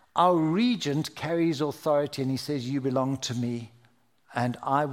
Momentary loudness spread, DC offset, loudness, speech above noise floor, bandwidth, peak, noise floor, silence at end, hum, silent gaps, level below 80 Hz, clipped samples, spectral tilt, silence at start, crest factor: 8 LU; under 0.1%; -27 LUFS; 38 dB; 16 kHz; -8 dBFS; -64 dBFS; 0 s; none; none; -70 dBFS; under 0.1%; -6 dB/octave; 0.15 s; 18 dB